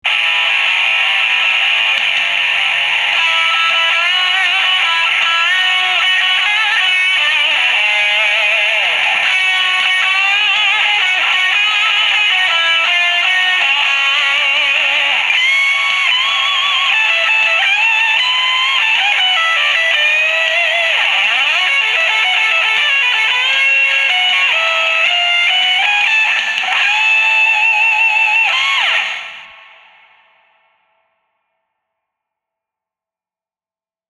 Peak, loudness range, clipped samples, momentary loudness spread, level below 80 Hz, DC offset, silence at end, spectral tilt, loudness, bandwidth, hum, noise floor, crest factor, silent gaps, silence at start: 0 dBFS; 1 LU; under 0.1%; 2 LU; -70 dBFS; under 0.1%; 4.6 s; 2.5 dB/octave; -10 LUFS; 13 kHz; none; under -90 dBFS; 14 dB; none; 0.05 s